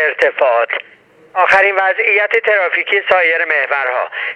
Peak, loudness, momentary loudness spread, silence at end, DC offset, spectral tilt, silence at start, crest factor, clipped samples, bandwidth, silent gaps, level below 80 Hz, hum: 0 dBFS; -13 LUFS; 8 LU; 0 s; under 0.1%; -2.5 dB/octave; 0 s; 14 dB; under 0.1%; 9.8 kHz; none; -58 dBFS; none